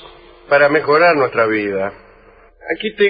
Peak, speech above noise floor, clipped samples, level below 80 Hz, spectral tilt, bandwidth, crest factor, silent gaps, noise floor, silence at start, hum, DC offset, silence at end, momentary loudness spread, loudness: 0 dBFS; 32 dB; under 0.1%; -52 dBFS; -10 dB/octave; 5 kHz; 16 dB; none; -46 dBFS; 0.05 s; none; under 0.1%; 0 s; 14 LU; -15 LUFS